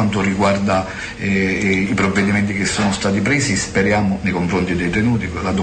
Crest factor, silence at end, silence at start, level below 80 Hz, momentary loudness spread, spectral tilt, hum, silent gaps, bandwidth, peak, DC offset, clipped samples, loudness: 12 dB; 0 s; 0 s; -38 dBFS; 4 LU; -5 dB/octave; none; none; 9.4 kHz; -6 dBFS; under 0.1%; under 0.1%; -17 LUFS